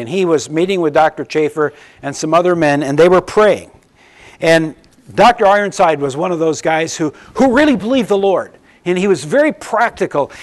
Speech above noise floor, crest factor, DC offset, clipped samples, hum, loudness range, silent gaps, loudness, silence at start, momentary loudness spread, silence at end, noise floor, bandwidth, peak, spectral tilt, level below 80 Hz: 32 dB; 12 dB; under 0.1%; under 0.1%; none; 2 LU; none; -14 LUFS; 0 s; 10 LU; 0 s; -46 dBFS; 12 kHz; -2 dBFS; -5 dB/octave; -48 dBFS